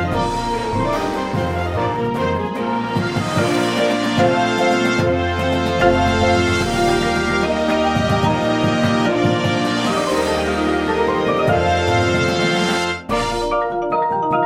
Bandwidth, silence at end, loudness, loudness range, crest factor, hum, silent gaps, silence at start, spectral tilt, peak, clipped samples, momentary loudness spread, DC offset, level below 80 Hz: 16 kHz; 0 s; -18 LUFS; 3 LU; 16 dB; none; none; 0 s; -5.5 dB/octave; -2 dBFS; under 0.1%; 5 LU; under 0.1%; -36 dBFS